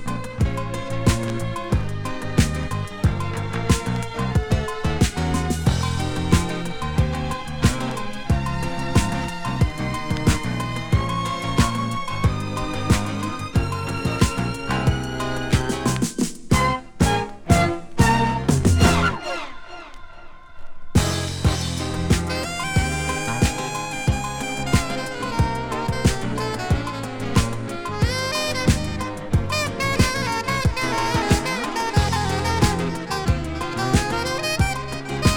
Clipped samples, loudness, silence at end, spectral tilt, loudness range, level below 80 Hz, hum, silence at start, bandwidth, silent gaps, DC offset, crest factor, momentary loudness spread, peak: under 0.1%; -23 LUFS; 0 s; -5 dB/octave; 3 LU; -30 dBFS; none; 0 s; over 20 kHz; none; under 0.1%; 20 dB; 7 LU; -2 dBFS